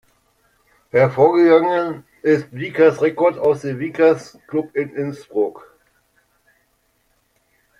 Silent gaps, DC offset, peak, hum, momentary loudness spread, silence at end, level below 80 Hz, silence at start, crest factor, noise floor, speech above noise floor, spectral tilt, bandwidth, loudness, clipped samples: none; under 0.1%; -2 dBFS; none; 12 LU; 2.2 s; -62 dBFS; 0.95 s; 18 dB; -64 dBFS; 47 dB; -7.5 dB/octave; 10.5 kHz; -18 LUFS; under 0.1%